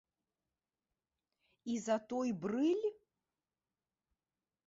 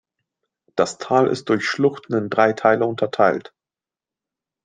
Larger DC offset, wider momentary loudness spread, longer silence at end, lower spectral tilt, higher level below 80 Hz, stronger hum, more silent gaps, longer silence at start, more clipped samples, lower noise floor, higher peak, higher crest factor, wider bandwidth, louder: neither; about the same, 8 LU vs 6 LU; first, 1.75 s vs 1.25 s; about the same, -5.5 dB/octave vs -5.5 dB/octave; second, -82 dBFS vs -66 dBFS; neither; neither; first, 1.65 s vs 0.75 s; neither; about the same, under -90 dBFS vs under -90 dBFS; second, -22 dBFS vs -2 dBFS; about the same, 20 dB vs 20 dB; second, 7.6 kHz vs 9.6 kHz; second, -37 LUFS vs -20 LUFS